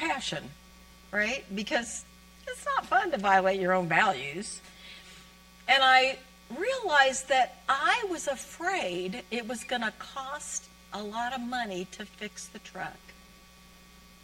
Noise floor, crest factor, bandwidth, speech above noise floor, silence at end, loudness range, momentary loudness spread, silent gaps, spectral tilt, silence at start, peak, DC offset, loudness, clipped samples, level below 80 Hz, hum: -54 dBFS; 22 dB; 16.5 kHz; 25 dB; 1.1 s; 11 LU; 18 LU; none; -2.5 dB/octave; 0 s; -8 dBFS; under 0.1%; -28 LUFS; under 0.1%; -60 dBFS; none